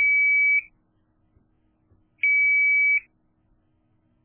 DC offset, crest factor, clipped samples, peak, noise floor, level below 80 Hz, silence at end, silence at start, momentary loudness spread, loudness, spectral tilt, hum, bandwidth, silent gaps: under 0.1%; 10 dB; under 0.1%; -14 dBFS; -66 dBFS; -68 dBFS; 1.25 s; 0 s; 7 LU; -18 LUFS; 1 dB/octave; none; 3.4 kHz; none